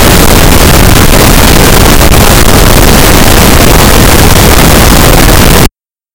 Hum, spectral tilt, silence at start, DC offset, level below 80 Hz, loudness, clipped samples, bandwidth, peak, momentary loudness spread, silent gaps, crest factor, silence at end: none; -4 dB/octave; 0 s; under 0.1%; -6 dBFS; -2 LUFS; 40%; over 20 kHz; 0 dBFS; 1 LU; none; 2 dB; 0.45 s